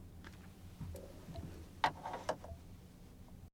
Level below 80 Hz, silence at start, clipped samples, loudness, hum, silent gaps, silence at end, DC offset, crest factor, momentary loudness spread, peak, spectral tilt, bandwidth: -58 dBFS; 0 s; under 0.1%; -45 LUFS; none; none; 0.05 s; under 0.1%; 30 dB; 19 LU; -16 dBFS; -5 dB/octave; over 20 kHz